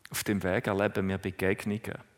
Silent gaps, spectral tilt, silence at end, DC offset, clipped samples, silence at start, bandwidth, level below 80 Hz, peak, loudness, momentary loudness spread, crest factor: none; -5.5 dB/octave; 0.15 s; under 0.1%; under 0.1%; 0.1 s; 16 kHz; -60 dBFS; -12 dBFS; -30 LUFS; 5 LU; 20 dB